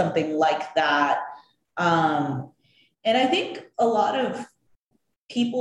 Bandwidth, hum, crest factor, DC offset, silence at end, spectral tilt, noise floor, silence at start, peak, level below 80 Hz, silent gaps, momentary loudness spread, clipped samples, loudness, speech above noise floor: 10.5 kHz; none; 16 dB; under 0.1%; 0 s; -5.5 dB/octave; -72 dBFS; 0 s; -8 dBFS; -70 dBFS; 4.76-4.87 s, 5.16-5.27 s; 15 LU; under 0.1%; -23 LUFS; 50 dB